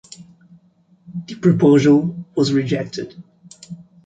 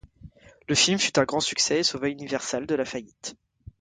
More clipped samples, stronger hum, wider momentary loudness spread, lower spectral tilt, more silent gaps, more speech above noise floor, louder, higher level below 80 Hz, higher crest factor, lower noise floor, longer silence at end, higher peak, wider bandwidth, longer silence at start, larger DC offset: neither; neither; first, 23 LU vs 15 LU; first, -7 dB/octave vs -2.5 dB/octave; neither; first, 39 dB vs 24 dB; first, -17 LUFS vs -24 LUFS; about the same, -58 dBFS vs -58 dBFS; about the same, 18 dB vs 20 dB; first, -55 dBFS vs -50 dBFS; second, 0.3 s vs 0.45 s; first, -2 dBFS vs -6 dBFS; about the same, 9 kHz vs 9.6 kHz; about the same, 0.2 s vs 0.25 s; neither